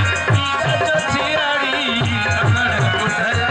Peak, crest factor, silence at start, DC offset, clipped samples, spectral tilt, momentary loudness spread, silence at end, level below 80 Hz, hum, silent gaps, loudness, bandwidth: -6 dBFS; 12 dB; 0 s; under 0.1%; under 0.1%; -4.5 dB/octave; 2 LU; 0 s; -46 dBFS; none; none; -17 LUFS; 9.6 kHz